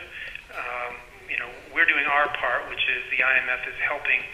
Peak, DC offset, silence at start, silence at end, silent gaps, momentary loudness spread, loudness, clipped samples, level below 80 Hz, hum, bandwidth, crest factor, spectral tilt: -4 dBFS; under 0.1%; 0 s; 0 s; none; 15 LU; -23 LUFS; under 0.1%; -54 dBFS; none; 15.5 kHz; 22 dB; -3 dB/octave